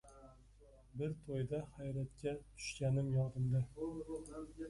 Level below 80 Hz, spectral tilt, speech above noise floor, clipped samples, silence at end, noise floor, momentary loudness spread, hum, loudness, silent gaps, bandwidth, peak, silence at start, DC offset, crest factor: -62 dBFS; -7 dB/octave; 23 dB; under 0.1%; 0 s; -63 dBFS; 11 LU; none; -41 LUFS; none; 11.5 kHz; -26 dBFS; 0.05 s; under 0.1%; 14 dB